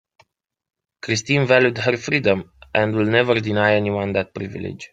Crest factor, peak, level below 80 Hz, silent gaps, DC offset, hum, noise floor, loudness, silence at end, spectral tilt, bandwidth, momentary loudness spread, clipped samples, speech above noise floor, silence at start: 18 dB; -2 dBFS; -56 dBFS; none; under 0.1%; none; -68 dBFS; -19 LUFS; 0.05 s; -5.5 dB/octave; 9.2 kHz; 13 LU; under 0.1%; 49 dB; 1.05 s